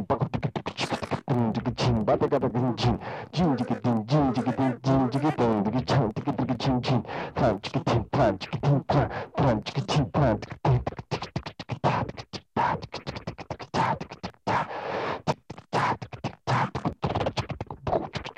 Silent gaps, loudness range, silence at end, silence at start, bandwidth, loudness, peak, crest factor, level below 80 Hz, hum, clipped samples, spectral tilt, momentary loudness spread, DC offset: none; 5 LU; 0.05 s; 0 s; 9.8 kHz; -27 LUFS; -10 dBFS; 16 dB; -46 dBFS; none; under 0.1%; -7 dB/octave; 10 LU; under 0.1%